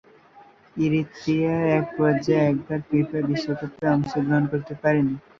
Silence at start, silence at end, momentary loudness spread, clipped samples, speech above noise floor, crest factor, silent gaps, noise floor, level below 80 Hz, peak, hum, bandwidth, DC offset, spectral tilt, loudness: 0.35 s; 0.2 s; 6 LU; under 0.1%; 29 dB; 16 dB; none; -51 dBFS; -56 dBFS; -6 dBFS; none; 7.2 kHz; under 0.1%; -8 dB/octave; -23 LUFS